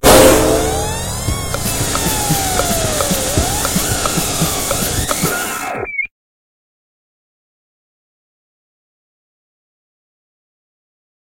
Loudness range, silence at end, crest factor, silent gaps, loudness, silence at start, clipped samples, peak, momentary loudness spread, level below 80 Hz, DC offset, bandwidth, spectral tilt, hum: 11 LU; 5.2 s; 18 dB; none; -15 LUFS; 0 s; under 0.1%; 0 dBFS; 8 LU; -30 dBFS; under 0.1%; 16.5 kHz; -3.5 dB/octave; none